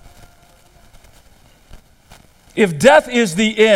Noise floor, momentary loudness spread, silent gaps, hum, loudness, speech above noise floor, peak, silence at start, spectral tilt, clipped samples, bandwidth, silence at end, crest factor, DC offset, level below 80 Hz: -49 dBFS; 7 LU; none; none; -13 LUFS; 36 dB; 0 dBFS; 1.75 s; -4 dB/octave; under 0.1%; 15.5 kHz; 0 s; 18 dB; under 0.1%; -48 dBFS